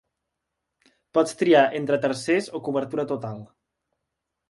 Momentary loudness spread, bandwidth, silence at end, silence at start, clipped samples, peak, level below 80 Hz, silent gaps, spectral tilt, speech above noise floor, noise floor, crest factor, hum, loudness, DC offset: 12 LU; 11.5 kHz; 1.05 s; 1.15 s; under 0.1%; -6 dBFS; -70 dBFS; none; -5.5 dB/octave; 59 dB; -82 dBFS; 20 dB; none; -23 LUFS; under 0.1%